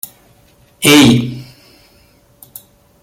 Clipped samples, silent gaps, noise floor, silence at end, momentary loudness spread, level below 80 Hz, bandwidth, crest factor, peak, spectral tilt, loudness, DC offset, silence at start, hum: under 0.1%; none; -49 dBFS; 1.6 s; 24 LU; -46 dBFS; 17 kHz; 16 dB; 0 dBFS; -4 dB/octave; -9 LUFS; under 0.1%; 0.8 s; none